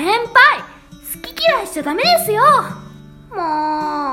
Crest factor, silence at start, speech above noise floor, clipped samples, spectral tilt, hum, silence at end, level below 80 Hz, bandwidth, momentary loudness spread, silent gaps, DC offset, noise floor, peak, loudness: 16 dB; 0 s; 22 dB; under 0.1%; -3 dB/octave; none; 0 s; -50 dBFS; 17 kHz; 19 LU; none; under 0.1%; -38 dBFS; 0 dBFS; -14 LUFS